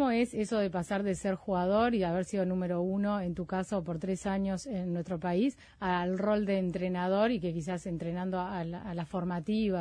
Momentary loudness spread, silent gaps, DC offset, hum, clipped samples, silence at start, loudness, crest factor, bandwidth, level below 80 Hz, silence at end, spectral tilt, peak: 7 LU; none; under 0.1%; none; under 0.1%; 0 s; -32 LUFS; 14 dB; 10.5 kHz; -56 dBFS; 0 s; -7 dB/octave; -18 dBFS